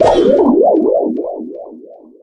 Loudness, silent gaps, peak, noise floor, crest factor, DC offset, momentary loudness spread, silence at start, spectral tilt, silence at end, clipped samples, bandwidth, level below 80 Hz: -12 LUFS; none; 0 dBFS; -37 dBFS; 12 dB; under 0.1%; 20 LU; 0 s; -7 dB/octave; 0.3 s; under 0.1%; 9.8 kHz; -42 dBFS